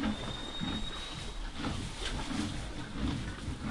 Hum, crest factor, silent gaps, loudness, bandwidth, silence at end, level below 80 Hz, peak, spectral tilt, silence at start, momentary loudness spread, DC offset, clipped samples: none; 16 dB; none; -38 LUFS; 11.5 kHz; 0 s; -42 dBFS; -22 dBFS; -4.5 dB/octave; 0 s; 5 LU; under 0.1%; under 0.1%